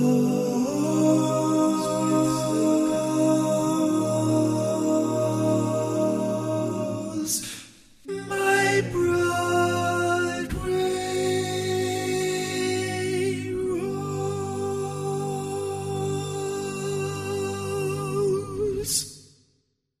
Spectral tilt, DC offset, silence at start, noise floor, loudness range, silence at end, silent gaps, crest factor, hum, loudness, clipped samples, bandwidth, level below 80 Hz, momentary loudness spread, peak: -5 dB/octave; under 0.1%; 0 s; -71 dBFS; 6 LU; 0.75 s; none; 16 dB; none; -25 LUFS; under 0.1%; 15.5 kHz; -52 dBFS; 7 LU; -10 dBFS